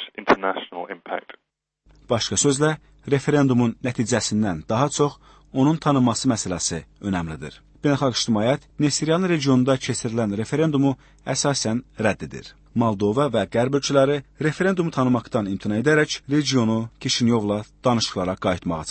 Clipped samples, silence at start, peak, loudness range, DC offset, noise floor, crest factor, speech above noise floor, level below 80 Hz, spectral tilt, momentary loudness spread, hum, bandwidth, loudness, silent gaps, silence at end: under 0.1%; 0 s; -4 dBFS; 2 LU; under 0.1%; -75 dBFS; 18 dB; 54 dB; -52 dBFS; -5 dB/octave; 9 LU; none; 8.8 kHz; -22 LUFS; none; 0 s